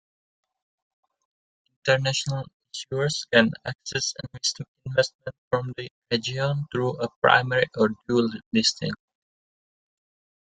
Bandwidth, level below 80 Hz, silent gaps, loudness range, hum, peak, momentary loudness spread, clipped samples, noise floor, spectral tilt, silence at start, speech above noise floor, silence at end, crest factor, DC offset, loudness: 9.6 kHz; -62 dBFS; 2.53-2.60 s, 3.75-3.79 s, 4.68-4.75 s, 5.14-5.19 s, 5.38-5.51 s, 5.90-6.02 s, 7.16-7.22 s, 8.46-8.51 s; 4 LU; none; -2 dBFS; 13 LU; under 0.1%; under -90 dBFS; -4 dB/octave; 1.85 s; over 65 dB; 1.5 s; 26 dB; under 0.1%; -25 LUFS